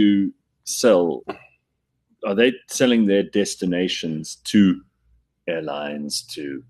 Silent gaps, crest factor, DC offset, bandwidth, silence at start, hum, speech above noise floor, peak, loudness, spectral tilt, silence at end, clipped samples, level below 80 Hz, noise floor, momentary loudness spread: none; 20 dB; under 0.1%; 13 kHz; 0 s; none; 54 dB; -2 dBFS; -21 LUFS; -4.5 dB/octave; 0.1 s; under 0.1%; -62 dBFS; -74 dBFS; 14 LU